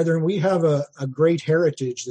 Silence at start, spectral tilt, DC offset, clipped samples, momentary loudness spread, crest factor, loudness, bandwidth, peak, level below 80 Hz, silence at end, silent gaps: 0 s; -6.5 dB/octave; under 0.1%; under 0.1%; 7 LU; 12 dB; -21 LUFS; 9.2 kHz; -8 dBFS; -66 dBFS; 0 s; none